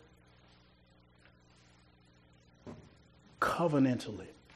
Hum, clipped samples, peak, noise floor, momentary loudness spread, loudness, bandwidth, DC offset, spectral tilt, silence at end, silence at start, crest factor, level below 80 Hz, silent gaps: 60 Hz at -65 dBFS; under 0.1%; -18 dBFS; -64 dBFS; 24 LU; -33 LUFS; 12.5 kHz; under 0.1%; -6.5 dB/octave; 0.25 s; 2.65 s; 20 dB; -68 dBFS; none